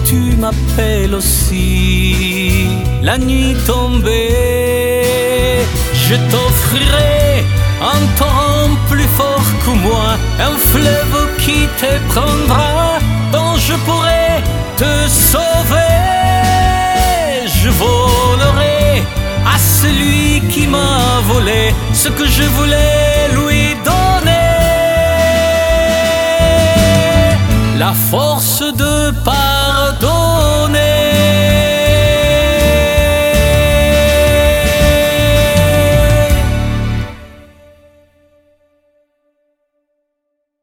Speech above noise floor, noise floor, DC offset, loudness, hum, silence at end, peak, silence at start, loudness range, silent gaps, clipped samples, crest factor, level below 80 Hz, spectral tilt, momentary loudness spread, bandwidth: 60 dB; -71 dBFS; under 0.1%; -11 LUFS; none; 3.3 s; 0 dBFS; 0 s; 3 LU; none; under 0.1%; 12 dB; -18 dBFS; -4.5 dB/octave; 4 LU; 19.5 kHz